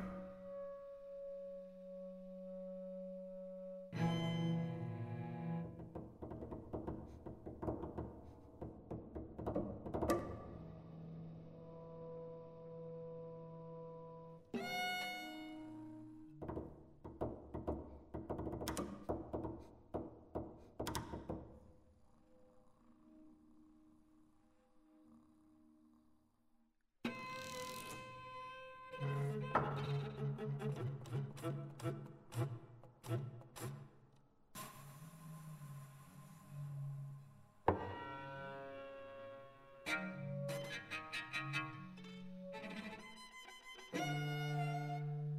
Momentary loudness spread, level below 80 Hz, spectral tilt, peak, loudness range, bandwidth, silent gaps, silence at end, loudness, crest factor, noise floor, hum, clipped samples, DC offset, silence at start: 14 LU; -64 dBFS; -6 dB/octave; -16 dBFS; 9 LU; 15.5 kHz; none; 0 s; -46 LUFS; 30 dB; -76 dBFS; none; under 0.1%; under 0.1%; 0 s